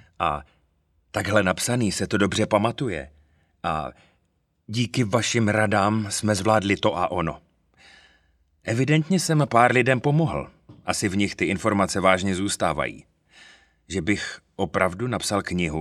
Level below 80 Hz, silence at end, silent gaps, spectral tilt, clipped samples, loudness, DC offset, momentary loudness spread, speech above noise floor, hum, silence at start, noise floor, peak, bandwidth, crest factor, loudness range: -50 dBFS; 0 s; none; -5 dB/octave; under 0.1%; -23 LUFS; under 0.1%; 12 LU; 47 dB; none; 0.2 s; -70 dBFS; -2 dBFS; 14 kHz; 22 dB; 4 LU